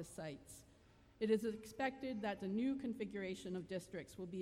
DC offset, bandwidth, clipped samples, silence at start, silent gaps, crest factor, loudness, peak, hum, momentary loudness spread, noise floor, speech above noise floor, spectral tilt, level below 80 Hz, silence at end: under 0.1%; 16 kHz; under 0.1%; 0 s; none; 20 dB; -43 LUFS; -24 dBFS; none; 12 LU; -67 dBFS; 24 dB; -6 dB/octave; -72 dBFS; 0 s